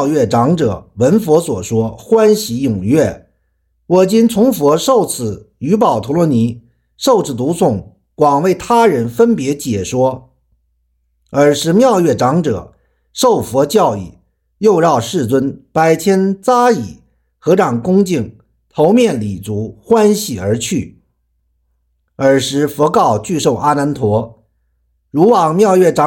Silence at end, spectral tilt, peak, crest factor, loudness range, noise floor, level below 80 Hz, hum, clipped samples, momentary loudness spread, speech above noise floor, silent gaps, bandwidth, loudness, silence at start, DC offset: 0 s; -6 dB/octave; 0 dBFS; 12 dB; 2 LU; -63 dBFS; -48 dBFS; none; under 0.1%; 10 LU; 51 dB; none; 17 kHz; -13 LUFS; 0 s; under 0.1%